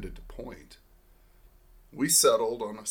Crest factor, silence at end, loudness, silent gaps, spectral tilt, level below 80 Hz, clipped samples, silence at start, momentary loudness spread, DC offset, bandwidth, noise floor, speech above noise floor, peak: 20 dB; 0 s; -24 LUFS; none; -2 dB/octave; -50 dBFS; under 0.1%; 0 s; 23 LU; under 0.1%; 19 kHz; -59 dBFS; 30 dB; -10 dBFS